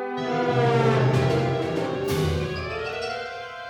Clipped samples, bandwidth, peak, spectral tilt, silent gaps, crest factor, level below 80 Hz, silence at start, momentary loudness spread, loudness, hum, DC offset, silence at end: under 0.1%; 16.5 kHz; -8 dBFS; -6.5 dB/octave; none; 16 dB; -46 dBFS; 0 s; 9 LU; -24 LUFS; none; under 0.1%; 0 s